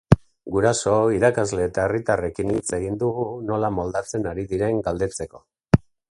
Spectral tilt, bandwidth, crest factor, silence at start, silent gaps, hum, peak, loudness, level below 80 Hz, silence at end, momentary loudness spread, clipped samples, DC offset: -6 dB/octave; 11.5 kHz; 22 dB; 0.1 s; none; none; 0 dBFS; -23 LUFS; -42 dBFS; 0.3 s; 8 LU; under 0.1%; under 0.1%